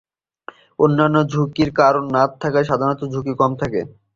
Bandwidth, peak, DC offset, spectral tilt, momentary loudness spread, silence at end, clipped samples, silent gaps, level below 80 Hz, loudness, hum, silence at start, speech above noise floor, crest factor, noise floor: 7.4 kHz; -2 dBFS; under 0.1%; -7.5 dB/octave; 9 LU; 0.3 s; under 0.1%; none; -50 dBFS; -18 LUFS; none; 0.8 s; 24 dB; 16 dB; -42 dBFS